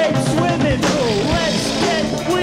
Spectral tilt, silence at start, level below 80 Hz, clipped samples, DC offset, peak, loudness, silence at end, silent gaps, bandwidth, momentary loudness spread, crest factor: -5 dB/octave; 0 s; -36 dBFS; under 0.1%; under 0.1%; -8 dBFS; -17 LUFS; 0 s; none; 16 kHz; 1 LU; 10 dB